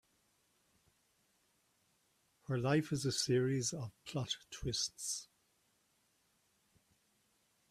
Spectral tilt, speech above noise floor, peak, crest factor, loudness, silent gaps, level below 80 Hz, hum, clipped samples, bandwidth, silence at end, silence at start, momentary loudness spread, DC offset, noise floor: -4.5 dB/octave; 40 dB; -20 dBFS; 22 dB; -37 LUFS; none; -66 dBFS; none; under 0.1%; 14.5 kHz; 2.45 s; 2.5 s; 10 LU; under 0.1%; -77 dBFS